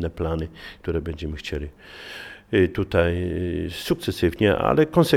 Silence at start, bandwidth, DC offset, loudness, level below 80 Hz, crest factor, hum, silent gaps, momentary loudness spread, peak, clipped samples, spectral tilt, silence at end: 0 s; 17 kHz; under 0.1%; -24 LUFS; -38 dBFS; 20 dB; none; none; 17 LU; -4 dBFS; under 0.1%; -6.5 dB/octave; 0 s